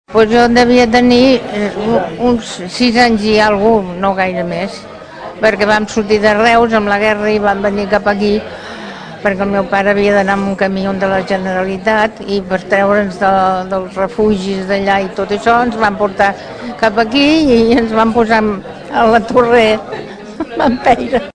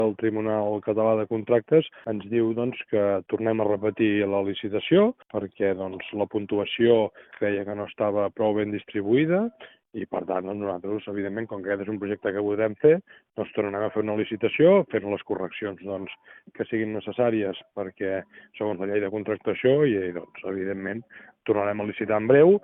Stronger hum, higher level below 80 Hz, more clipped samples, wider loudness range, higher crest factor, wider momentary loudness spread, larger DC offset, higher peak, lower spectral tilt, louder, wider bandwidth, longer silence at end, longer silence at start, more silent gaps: neither; first, -38 dBFS vs -68 dBFS; first, 0.3% vs under 0.1%; about the same, 3 LU vs 5 LU; second, 12 dB vs 18 dB; about the same, 10 LU vs 12 LU; neither; first, 0 dBFS vs -6 dBFS; about the same, -5.5 dB/octave vs -5.5 dB/octave; first, -12 LUFS vs -25 LUFS; first, 11 kHz vs 3.9 kHz; about the same, 0.05 s vs 0.05 s; about the same, 0.1 s vs 0 s; neither